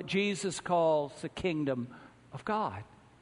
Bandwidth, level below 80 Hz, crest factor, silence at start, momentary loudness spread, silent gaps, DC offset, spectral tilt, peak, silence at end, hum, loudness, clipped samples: 10.5 kHz; -64 dBFS; 16 dB; 0 s; 15 LU; none; under 0.1%; -5 dB/octave; -18 dBFS; 0.4 s; none; -32 LUFS; under 0.1%